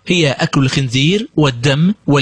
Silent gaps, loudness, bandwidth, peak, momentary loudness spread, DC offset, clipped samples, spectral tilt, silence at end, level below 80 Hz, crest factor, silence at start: none; -14 LUFS; 10 kHz; -2 dBFS; 1 LU; under 0.1%; under 0.1%; -5.5 dB/octave; 0 s; -44 dBFS; 12 dB; 0.05 s